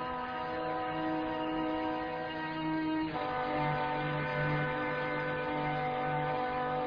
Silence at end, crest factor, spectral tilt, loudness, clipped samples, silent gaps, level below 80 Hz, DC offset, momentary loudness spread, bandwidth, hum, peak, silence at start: 0 s; 14 dB; -4.5 dB/octave; -34 LUFS; under 0.1%; none; -58 dBFS; under 0.1%; 4 LU; 5.2 kHz; none; -20 dBFS; 0 s